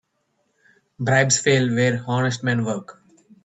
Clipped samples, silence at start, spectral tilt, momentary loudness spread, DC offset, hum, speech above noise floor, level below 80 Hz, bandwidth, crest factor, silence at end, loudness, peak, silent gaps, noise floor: under 0.1%; 1 s; -4.5 dB/octave; 11 LU; under 0.1%; none; 50 dB; -62 dBFS; 8.4 kHz; 20 dB; 0.55 s; -20 LUFS; -2 dBFS; none; -70 dBFS